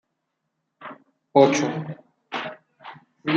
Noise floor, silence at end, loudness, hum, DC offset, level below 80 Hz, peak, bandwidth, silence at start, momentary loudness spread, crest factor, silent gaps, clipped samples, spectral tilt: -78 dBFS; 0 s; -22 LUFS; none; under 0.1%; -72 dBFS; -2 dBFS; 8.8 kHz; 0.8 s; 26 LU; 24 dB; none; under 0.1%; -5 dB/octave